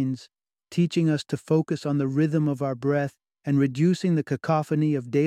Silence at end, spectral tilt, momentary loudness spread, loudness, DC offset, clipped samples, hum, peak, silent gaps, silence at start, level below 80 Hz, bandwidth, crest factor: 0 s; -7.5 dB/octave; 6 LU; -25 LUFS; under 0.1%; under 0.1%; none; -10 dBFS; none; 0 s; -68 dBFS; 11.5 kHz; 14 dB